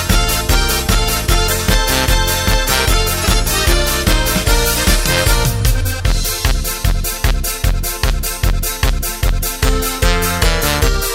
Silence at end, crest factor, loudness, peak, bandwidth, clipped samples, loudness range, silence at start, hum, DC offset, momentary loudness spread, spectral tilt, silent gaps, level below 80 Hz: 0 s; 14 dB; -15 LUFS; 0 dBFS; 16.5 kHz; under 0.1%; 4 LU; 0 s; none; under 0.1%; 5 LU; -3 dB/octave; none; -16 dBFS